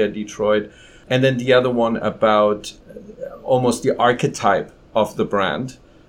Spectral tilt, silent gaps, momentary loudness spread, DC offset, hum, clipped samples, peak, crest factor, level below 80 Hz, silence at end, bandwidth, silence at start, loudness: -5.5 dB/octave; none; 15 LU; under 0.1%; none; under 0.1%; -2 dBFS; 18 dB; -50 dBFS; 0.35 s; 15.5 kHz; 0 s; -19 LUFS